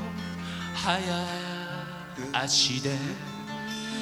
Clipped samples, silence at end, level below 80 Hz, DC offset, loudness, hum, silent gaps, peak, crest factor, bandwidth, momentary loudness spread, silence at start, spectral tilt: under 0.1%; 0 s; -58 dBFS; under 0.1%; -29 LUFS; none; none; -10 dBFS; 22 dB; 16.5 kHz; 14 LU; 0 s; -3 dB/octave